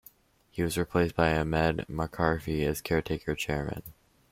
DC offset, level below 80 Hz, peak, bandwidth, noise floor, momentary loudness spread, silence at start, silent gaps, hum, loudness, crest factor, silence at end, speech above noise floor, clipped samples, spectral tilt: under 0.1%; -46 dBFS; -8 dBFS; 16.5 kHz; -62 dBFS; 8 LU; 0.55 s; none; none; -29 LUFS; 20 dB; 0.4 s; 33 dB; under 0.1%; -6 dB/octave